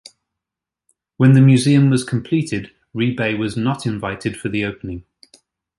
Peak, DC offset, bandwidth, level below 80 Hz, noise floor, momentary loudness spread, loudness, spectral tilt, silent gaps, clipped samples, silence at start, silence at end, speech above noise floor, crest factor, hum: -2 dBFS; under 0.1%; 11.5 kHz; -50 dBFS; -86 dBFS; 16 LU; -17 LUFS; -6.5 dB/octave; none; under 0.1%; 1.2 s; 0.8 s; 70 dB; 16 dB; none